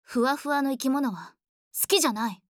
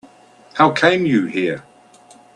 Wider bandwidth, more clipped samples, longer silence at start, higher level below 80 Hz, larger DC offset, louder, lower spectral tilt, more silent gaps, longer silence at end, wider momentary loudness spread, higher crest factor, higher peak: first, over 20 kHz vs 11 kHz; neither; second, 0.1 s vs 0.55 s; second, -74 dBFS vs -62 dBFS; neither; second, -26 LUFS vs -16 LUFS; second, -2.5 dB/octave vs -6 dB/octave; first, 1.49-1.71 s vs none; second, 0.25 s vs 0.75 s; second, 10 LU vs 15 LU; about the same, 20 dB vs 18 dB; second, -8 dBFS vs 0 dBFS